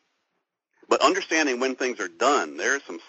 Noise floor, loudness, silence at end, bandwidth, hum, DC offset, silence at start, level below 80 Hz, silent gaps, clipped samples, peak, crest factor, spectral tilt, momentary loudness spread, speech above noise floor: -79 dBFS; -23 LUFS; 0.1 s; 8 kHz; none; under 0.1%; 0.9 s; -78 dBFS; none; under 0.1%; -6 dBFS; 20 dB; 0.5 dB/octave; 6 LU; 54 dB